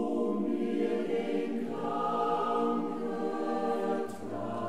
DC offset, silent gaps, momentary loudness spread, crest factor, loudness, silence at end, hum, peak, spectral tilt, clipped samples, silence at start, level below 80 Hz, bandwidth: 0.5%; none; 5 LU; 14 dB; -32 LUFS; 0 s; none; -18 dBFS; -7 dB/octave; under 0.1%; 0 s; -68 dBFS; 13 kHz